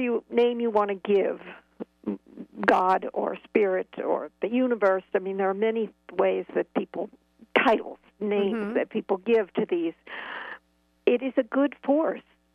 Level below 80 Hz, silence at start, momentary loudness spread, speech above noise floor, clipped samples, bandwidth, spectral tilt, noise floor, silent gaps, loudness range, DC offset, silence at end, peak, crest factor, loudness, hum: -70 dBFS; 0 s; 14 LU; 39 dB; under 0.1%; 7 kHz; -7 dB/octave; -65 dBFS; none; 2 LU; under 0.1%; 0.35 s; -6 dBFS; 22 dB; -26 LUFS; none